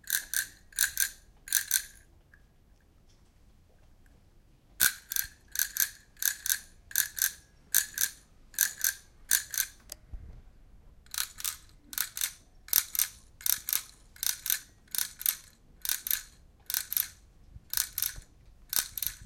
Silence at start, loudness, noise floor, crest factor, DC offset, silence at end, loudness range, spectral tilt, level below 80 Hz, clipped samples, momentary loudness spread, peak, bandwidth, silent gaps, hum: 0.05 s; -30 LUFS; -61 dBFS; 32 dB; under 0.1%; 0 s; 5 LU; 2 dB/octave; -58 dBFS; under 0.1%; 12 LU; -2 dBFS; 17.5 kHz; none; none